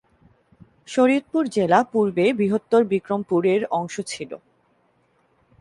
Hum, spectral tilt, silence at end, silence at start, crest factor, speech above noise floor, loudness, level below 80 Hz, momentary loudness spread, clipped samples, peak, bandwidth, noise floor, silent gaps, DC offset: none; -6 dB/octave; 1.25 s; 0.9 s; 20 dB; 43 dB; -21 LUFS; -64 dBFS; 12 LU; under 0.1%; -4 dBFS; 11.5 kHz; -64 dBFS; none; under 0.1%